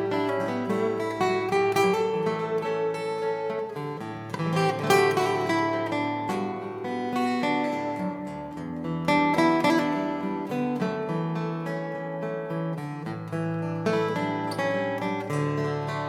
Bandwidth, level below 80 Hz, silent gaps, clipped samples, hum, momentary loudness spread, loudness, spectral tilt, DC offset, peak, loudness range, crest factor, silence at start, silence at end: 18 kHz; -64 dBFS; none; under 0.1%; none; 10 LU; -27 LUFS; -6 dB/octave; under 0.1%; -6 dBFS; 4 LU; 20 dB; 0 s; 0 s